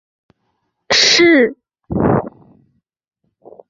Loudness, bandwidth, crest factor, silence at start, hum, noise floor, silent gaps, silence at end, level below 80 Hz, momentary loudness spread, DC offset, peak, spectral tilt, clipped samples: -12 LUFS; 7.8 kHz; 18 dB; 0.9 s; none; -69 dBFS; none; 1.4 s; -44 dBFS; 14 LU; under 0.1%; 0 dBFS; -3.5 dB/octave; under 0.1%